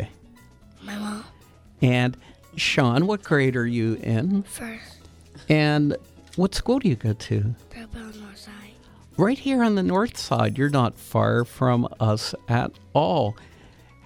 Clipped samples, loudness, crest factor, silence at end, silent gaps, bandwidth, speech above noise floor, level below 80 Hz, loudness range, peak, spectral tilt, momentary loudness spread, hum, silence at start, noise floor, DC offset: under 0.1%; -23 LUFS; 20 dB; 0.7 s; none; 15.5 kHz; 28 dB; -48 dBFS; 3 LU; -4 dBFS; -6.5 dB/octave; 18 LU; none; 0 s; -51 dBFS; under 0.1%